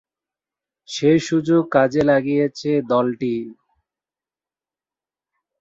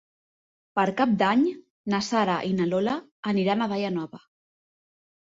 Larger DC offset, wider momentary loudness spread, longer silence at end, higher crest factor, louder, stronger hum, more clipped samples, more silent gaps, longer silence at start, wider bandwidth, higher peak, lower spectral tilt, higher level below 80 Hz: neither; about the same, 9 LU vs 9 LU; first, 2.1 s vs 1.2 s; about the same, 18 dB vs 18 dB; first, -19 LUFS vs -25 LUFS; neither; neither; second, none vs 1.70-1.84 s, 3.11-3.23 s; first, 0.9 s vs 0.75 s; about the same, 7.8 kHz vs 7.8 kHz; first, -2 dBFS vs -8 dBFS; about the same, -6.5 dB/octave vs -6 dB/octave; first, -58 dBFS vs -66 dBFS